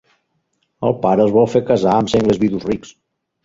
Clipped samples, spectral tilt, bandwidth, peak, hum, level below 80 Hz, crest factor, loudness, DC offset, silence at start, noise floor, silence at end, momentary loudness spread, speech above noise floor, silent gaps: under 0.1%; -7 dB/octave; 7.8 kHz; -2 dBFS; none; -46 dBFS; 16 dB; -16 LUFS; under 0.1%; 0.8 s; -68 dBFS; 0.55 s; 9 LU; 53 dB; none